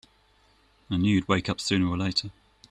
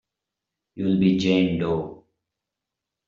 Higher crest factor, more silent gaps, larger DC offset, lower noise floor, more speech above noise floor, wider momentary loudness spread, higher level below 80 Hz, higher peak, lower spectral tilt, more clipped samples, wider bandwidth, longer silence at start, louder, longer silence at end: about the same, 20 dB vs 18 dB; neither; neither; second, -62 dBFS vs -85 dBFS; second, 37 dB vs 64 dB; second, 6 LU vs 9 LU; about the same, -54 dBFS vs -58 dBFS; about the same, -8 dBFS vs -8 dBFS; second, -5 dB/octave vs -6.5 dB/octave; neither; first, 11 kHz vs 7.2 kHz; first, 0.9 s vs 0.75 s; second, -26 LUFS vs -22 LUFS; second, 0.4 s vs 1.1 s